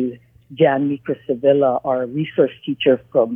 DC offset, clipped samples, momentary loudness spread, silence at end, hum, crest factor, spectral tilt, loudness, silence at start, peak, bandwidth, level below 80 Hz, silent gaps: under 0.1%; under 0.1%; 7 LU; 0 s; none; 16 dB; -9.5 dB/octave; -19 LUFS; 0 s; -2 dBFS; 3.6 kHz; -62 dBFS; none